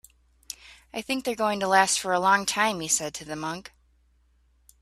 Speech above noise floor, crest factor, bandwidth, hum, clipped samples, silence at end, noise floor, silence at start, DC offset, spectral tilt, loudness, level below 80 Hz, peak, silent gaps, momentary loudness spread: 38 dB; 22 dB; 15.5 kHz; none; under 0.1%; 1.2 s; -64 dBFS; 0.65 s; under 0.1%; -2 dB/octave; -24 LUFS; -62 dBFS; -4 dBFS; none; 19 LU